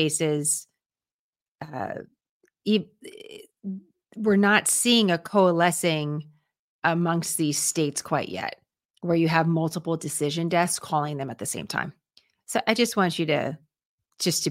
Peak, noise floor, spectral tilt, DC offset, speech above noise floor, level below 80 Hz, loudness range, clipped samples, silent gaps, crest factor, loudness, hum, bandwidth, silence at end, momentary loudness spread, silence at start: -4 dBFS; under -90 dBFS; -4 dB/octave; under 0.1%; over 66 dB; -70 dBFS; 7 LU; under 0.1%; 1.14-1.33 s, 1.41-1.55 s, 2.29-2.41 s, 6.59-6.82 s, 8.85-8.89 s, 13.85-13.98 s; 22 dB; -24 LUFS; none; 16.5 kHz; 0 s; 18 LU; 0 s